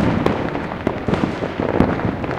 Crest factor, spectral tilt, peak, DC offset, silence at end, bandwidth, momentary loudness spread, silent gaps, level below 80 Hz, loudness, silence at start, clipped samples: 20 dB; -8 dB/octave; 0 dBFS; under 0.1%; 0 s; 11.5 kHz; 5 LU; none; -36 dBFS; -21 LUFS; 0 s; under 0.1%